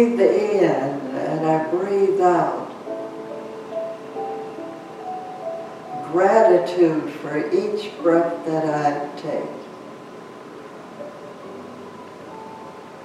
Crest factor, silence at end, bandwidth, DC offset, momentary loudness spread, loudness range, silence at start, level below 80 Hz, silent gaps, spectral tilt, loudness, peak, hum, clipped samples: 20 dB; 0 s; 11 kHz; under 0.1%; 21 LU; 14 LU; 0 s; -74 dBFS; none; -7 dB/octave; -21 LUFS; -2 dBFS; none; under 0.1%